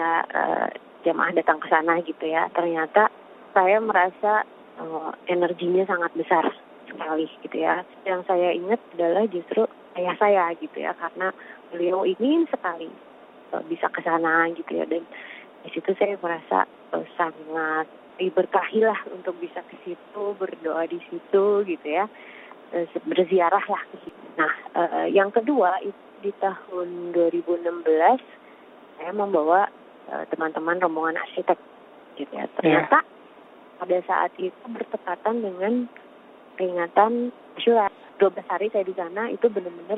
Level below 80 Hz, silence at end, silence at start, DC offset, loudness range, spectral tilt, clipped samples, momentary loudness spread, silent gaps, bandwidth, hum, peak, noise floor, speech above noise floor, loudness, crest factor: -76 dBFS; 0 s; 0 s; under 0.1%; 4 LU; -8.5 dB/octave; under 0.1%; 14 LU; none; 4.5 kHz; none; -4 dBFS; -48 dBFS; 25 dB; -24 LUFS; 20 dB